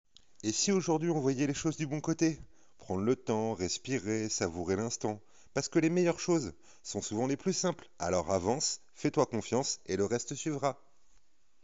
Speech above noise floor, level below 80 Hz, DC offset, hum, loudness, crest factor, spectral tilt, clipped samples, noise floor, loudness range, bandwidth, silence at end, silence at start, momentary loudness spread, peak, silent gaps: 38 dB; -66 dBFS; 0.2%; none; -32 LUFS; 18 dB; -5.5 dB/octave; under 0.1%; -70 dBFS; 2 LU; 8 kHz; 0.9 s; 0.45 s; 9 LU; -14 dBFS; none